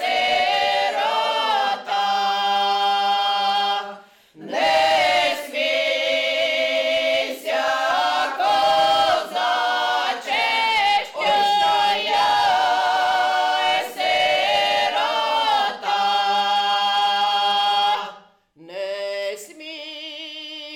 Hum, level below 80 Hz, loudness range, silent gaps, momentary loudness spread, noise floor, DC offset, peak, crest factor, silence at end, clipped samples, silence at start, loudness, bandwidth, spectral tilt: none; -62 dBFS; 2 LU; none; 10 LU; -49 dBFS; under 0.1%; -12 dBFS; 10 dB; 0 s; under 0.1%; 0 s; -19 LUFS; 17.5 kHz; -1 dB/octave